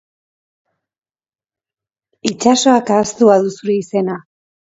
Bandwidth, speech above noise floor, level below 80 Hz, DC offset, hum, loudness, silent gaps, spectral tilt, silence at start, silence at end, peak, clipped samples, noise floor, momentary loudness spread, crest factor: 8 kHz; over 76 dB; -60 dBFS; under 0.1%; none; -14 LUFS; none; -4.5 dB/octave; 2.25 s; 0.5 s; 0 dBFS; under 0.1%; under -90 dBFS; 11 LU; 18 dB